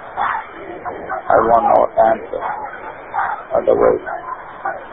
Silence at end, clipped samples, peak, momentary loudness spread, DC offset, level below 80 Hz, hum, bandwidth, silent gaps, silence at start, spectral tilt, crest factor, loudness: 0 s; under 0.1%; 0 dBFS; 16 LU; 0.3%; -46 dBFS; none; 3.9 kHz; none; 0 s; -9 dB/octave; 18 dB; -17 LUFS